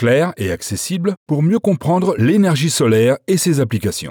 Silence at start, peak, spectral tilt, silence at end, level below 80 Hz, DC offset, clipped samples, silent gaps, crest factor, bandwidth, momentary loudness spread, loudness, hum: 0 s; -6 dBFS; -5.5 dB/octave; 0 s; -50 dBFS; under 0.1%; under 0.1%; 1.17-1.26 s; 10 dB; over 20 kHz; 7 LU; -16 LUFS; none